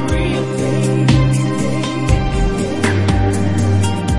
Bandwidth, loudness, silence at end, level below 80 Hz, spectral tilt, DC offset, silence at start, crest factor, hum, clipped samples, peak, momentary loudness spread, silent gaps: 11.5 kHz; -16 LUFS; 0 s; -24 dBFS; -6.5 dB/octave; under 0.1%; 0 s; 14 dB; none; under 0.1%; 0 dBFS; 5 LU; none